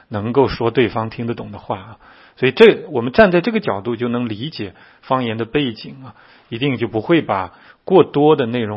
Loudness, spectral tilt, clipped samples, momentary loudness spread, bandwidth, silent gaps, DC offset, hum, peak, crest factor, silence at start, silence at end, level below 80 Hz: -17 LUFS; -8.5 dB/octave; under 0.1%; 16 LU; 5.8 kHz; none; under 0.1%; none; 0 dBFS; 18 dB; 0.1 s; 0 s; -48 dBFS